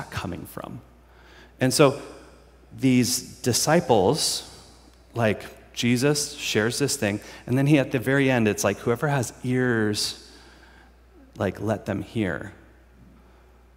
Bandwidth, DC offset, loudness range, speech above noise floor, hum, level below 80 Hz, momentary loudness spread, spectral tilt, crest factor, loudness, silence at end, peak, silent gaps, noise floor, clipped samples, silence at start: 16 kHz; under 0.1%; 6 LU; 30 dB; none; -54 dBFS; 16 LU; -4.5 dB/octave; 22 dB; -23 LUFS; 1.2 s; -2 dBFS; none; -53 dBFS; under 0.1%; 0 s